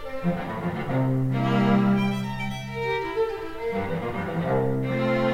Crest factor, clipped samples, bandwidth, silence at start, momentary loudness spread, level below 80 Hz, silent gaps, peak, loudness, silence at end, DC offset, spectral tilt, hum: 14 dB; under 0.1%; 15.5 kHz; 0 s; 9 LU; -48 dBFS; none; -10 dBFS; -26 LUFS; 0 s; under 0.1%; -8 dB/octave; none